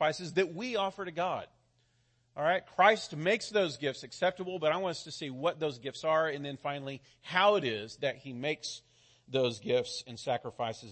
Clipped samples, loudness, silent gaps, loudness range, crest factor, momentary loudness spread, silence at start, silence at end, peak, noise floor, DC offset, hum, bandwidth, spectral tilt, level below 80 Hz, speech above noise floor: under 0.1%; -32 LUFS; none; 3 LU; 22 dB; 12 LU; 0 s; 0 s; -10 dBFS; -72 dBFS; under 0.1%; none; 8.8 kHz; -4 dB/octave; -74 dBFS; 40 dB